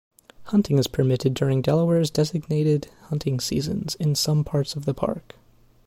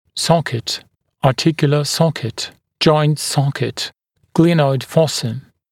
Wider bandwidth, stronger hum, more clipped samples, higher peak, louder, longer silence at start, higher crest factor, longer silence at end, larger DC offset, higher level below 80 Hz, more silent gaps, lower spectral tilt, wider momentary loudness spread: about the same, 16 kHz vs 16 kHz; neither; neither; second, -8 dBFS vs 0 dBFS; second, -23 LUFS vs -17 LUFS; first, 0.4 s vs 0.15 s; about the same, 16 dB vs 18 dB; first, 0.65 s vs 0.3 s; neither; about the same, -50 dBFS vs -54 dBFS; neither; about the same, -6 dB/octave vs -5.5 dB/octave; second, 7 LU vs 12 LU